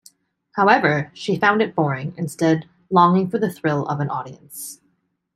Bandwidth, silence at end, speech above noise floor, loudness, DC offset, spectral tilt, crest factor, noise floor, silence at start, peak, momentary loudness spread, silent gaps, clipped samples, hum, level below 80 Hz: 15 kHz; 0.6 s; 48 dB; -19 LUFS; under 0.1%; -6 dB/octave; 18 dB; -68 dBFS; 0.55 s; -2 dBFS; 17 LU; none; under 0.1%; none; -64 dBFS